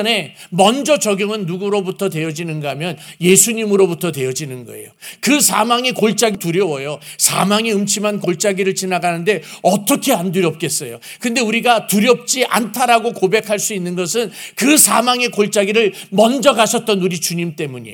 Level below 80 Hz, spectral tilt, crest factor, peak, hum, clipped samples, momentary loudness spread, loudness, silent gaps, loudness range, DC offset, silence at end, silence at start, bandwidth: -64 dBFS; -3 dB/octave; 16 dB; 0 dBFS; none; under 0.1%; 11 LU; -15 LUFS; none; 3 LU; under 0.1%; 0 s; 0 s; over 20 kHz